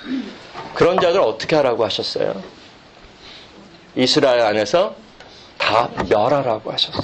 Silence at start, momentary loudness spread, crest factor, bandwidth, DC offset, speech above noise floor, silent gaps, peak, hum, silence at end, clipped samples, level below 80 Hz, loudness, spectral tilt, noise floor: 0 s; 17 LU; 18 dB; 9 kHz; under 0.1%; 27 dB; none; -2 dBFS; none; 0 s; under 0.1%; -50 dBFS; -18 LUFS; -4.5 dB/octave; -44 dBFS